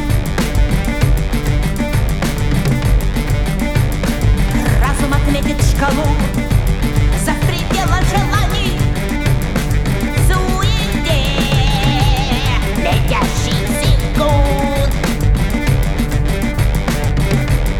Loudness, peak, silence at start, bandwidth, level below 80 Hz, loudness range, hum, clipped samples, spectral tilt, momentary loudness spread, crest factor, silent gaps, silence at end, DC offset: -16 LUFS; 0 dBFS; 0 s; 17 kHz; -18 dBFS; 2 LU; none; under 0.1%; -5.5 dB/octave; 3 LU; 12 dB; none; 0 s; under 0.1%